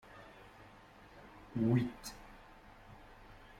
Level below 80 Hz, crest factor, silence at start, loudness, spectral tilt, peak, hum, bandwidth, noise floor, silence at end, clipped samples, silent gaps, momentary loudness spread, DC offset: -62 dBFS; 22 dB; 0.1 s; -36 LUFS; -7 dB/octave; -20 dBFS; none; 16 kHz; -58 dBFS; 0.25 s; under 0.1%; none; 25 LU; under 0.1%